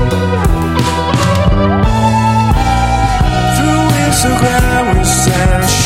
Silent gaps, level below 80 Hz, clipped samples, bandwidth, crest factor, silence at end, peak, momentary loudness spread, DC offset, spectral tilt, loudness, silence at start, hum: none; -18 dBFS; under 0.1%; 16.5 kHz; 10 dB; 0 s; 0 dBFS; 2 LU; under 0.1%; -5 dB/octave; -11 LUFS; 0 s; none